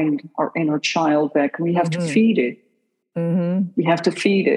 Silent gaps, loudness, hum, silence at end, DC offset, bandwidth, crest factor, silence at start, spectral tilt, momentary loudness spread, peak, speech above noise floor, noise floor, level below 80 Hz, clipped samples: none; -20 LUFS; none; 0 s; under 0.1%; 11 kHz; 16 dB; 0 s; -6 dB/octave; 6 LU; -4 dBFS; 49 dB; -68 dBFS; -76 dBFS; under 0.1%